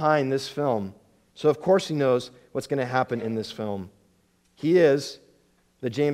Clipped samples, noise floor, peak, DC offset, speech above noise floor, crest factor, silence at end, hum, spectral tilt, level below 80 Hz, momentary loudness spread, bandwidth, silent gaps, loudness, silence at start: under 0.1%; -65 dBFS; -6 dBFS; under 0.1%; 41 dB; 18 dB; 0 s; none; -6 dB/octave; -68 dBFS; 14 LU; 15 kHz; none; -25 LUFS; 0 s